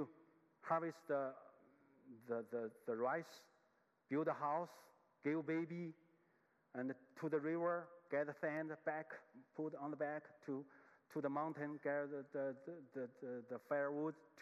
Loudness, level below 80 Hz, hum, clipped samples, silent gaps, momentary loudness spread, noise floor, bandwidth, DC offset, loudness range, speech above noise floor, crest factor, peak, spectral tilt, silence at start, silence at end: -45 LUFS; under -90 dBFS; none; under 0.1%; none; 12 LU; -79 dBFS; 13.5 kHz; under 0.1%; 2 LU; 35 dB; 18 dB; -26 dBFS; -8 dB/octave; 0 s; 0 s